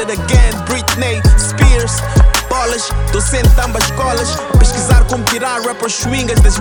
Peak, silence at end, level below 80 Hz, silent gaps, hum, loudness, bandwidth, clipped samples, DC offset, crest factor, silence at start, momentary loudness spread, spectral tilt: 0 dBFS; 0 s; -14 dBFS; none; none; -13 LUFS; 20 kHz; under 0.1%; under 0.1%; 10 dB; 0 s; 5 LU; -4 dB/octave